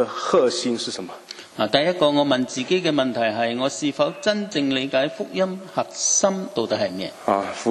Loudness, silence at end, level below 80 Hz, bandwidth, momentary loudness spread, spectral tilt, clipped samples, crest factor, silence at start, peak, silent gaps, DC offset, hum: -22 LUFS; 0 s; -66 dBFS; 12 kHz; 9 LU; -3 dB/octave; under 0.1%; 22 dB; 0 s; 0 dBFS; none; under 0.1%; none